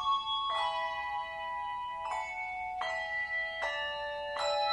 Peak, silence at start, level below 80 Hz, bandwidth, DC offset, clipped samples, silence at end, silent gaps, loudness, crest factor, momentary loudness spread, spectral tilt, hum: -20 dBFS; 0 s; -64 dBFS; 10.5 kHz; under 0.1%; under 0.1%; 0 s; none; -34 LUFS; 16 dB; 6 LU; -1 dB/octave; none